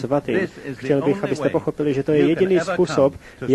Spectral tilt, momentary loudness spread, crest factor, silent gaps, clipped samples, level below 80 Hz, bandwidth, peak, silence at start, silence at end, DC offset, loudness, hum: -7 dB/octave; 6 LU; 14 dB; none; under 0.1%; -50 dBFS; 12 kHz; -4 dBFS; 0 s; 0 s; under 0.1%; -20 LUFS; none